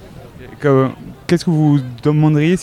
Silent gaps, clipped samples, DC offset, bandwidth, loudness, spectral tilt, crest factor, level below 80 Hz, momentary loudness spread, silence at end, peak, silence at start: none; under 0.1%; under 0.1%; 11.5 kHz; -15 LUFS; -7.5 dB/octave; 14 dB; -46 dBFS; 7 LU; 0 s; -2 dBFS; 0 s